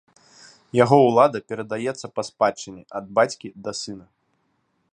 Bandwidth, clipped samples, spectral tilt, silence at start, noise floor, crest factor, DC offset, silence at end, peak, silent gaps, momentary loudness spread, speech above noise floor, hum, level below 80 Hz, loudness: 10.5 kHz; under 0.1%; -5.5 dB/octave; 0.75 s; -70 dBFS; 22 dB; under 0.1%; 0.9 s; -2 dBFS; none; 19 LU; 48 dB; none; -66 dBFS; -21 LUFS